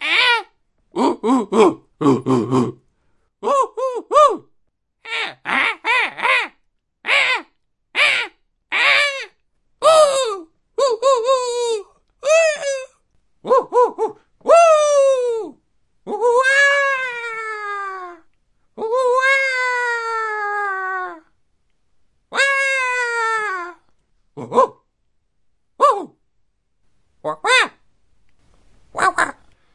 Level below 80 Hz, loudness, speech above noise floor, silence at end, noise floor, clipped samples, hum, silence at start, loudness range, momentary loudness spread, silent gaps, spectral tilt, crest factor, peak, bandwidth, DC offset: -64 dBFS; -17 LUFS; 53 dB; 0.45 s; -68 dBFS; under 0.1%; none; 0 s; 5 LU; 15 LU; none; -3 dB/octave; 18 dB; 0 dBFS; 11.5 kHz; under 0.1%